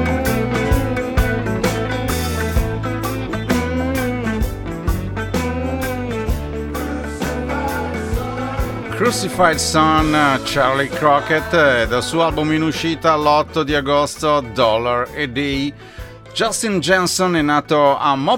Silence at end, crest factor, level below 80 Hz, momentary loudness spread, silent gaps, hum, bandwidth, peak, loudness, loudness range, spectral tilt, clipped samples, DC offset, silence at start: 0 s; 18 dB; -30 dBFS; 9 LU; none; none; 19 kHz; 0 dBFS; -18 LUFS; 7 LU; -4.5 dB/octave; under 0.1%; under 0.1%; 0 s